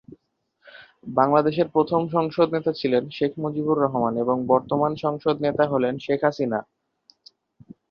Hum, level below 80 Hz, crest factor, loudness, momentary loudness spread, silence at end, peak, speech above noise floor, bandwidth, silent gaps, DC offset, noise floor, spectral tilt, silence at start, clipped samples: none; -62 dBFS; 20 dB; -23 LUFS; 7 LU; 1.3 s; -4 dBFS; 48 dB; 6.8 kHz; none; under 0.1%; -70 dBFS; -8.5 dB/octave; 0.1 s; under 0.1%